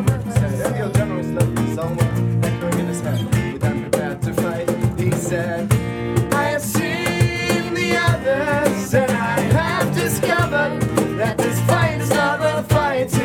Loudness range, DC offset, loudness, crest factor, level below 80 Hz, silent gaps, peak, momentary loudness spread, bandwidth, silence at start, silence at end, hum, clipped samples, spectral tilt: 3 LU; under 0.1%; -19 LUFS; 18 dB; -38 dBFS; none; 0 dBFS; 4 LU; 17.5 kHz; 0 s; 0 s; none; under 0.1%; -5.5 dB/octave